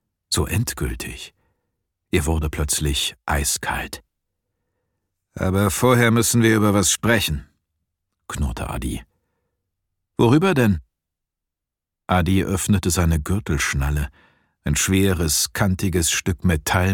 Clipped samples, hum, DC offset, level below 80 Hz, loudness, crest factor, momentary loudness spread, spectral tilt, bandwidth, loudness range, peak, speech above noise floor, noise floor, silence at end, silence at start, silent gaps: under 0.1%; none; under 0.1%; -34 dBFS; -20 LUFS; 20 dB; 13 LU; -4.5 dB/octave; 19 kHz; 5 LU; -2 dBFS; 66 dB; -85 dBFS; 0 s; 0.3 s; none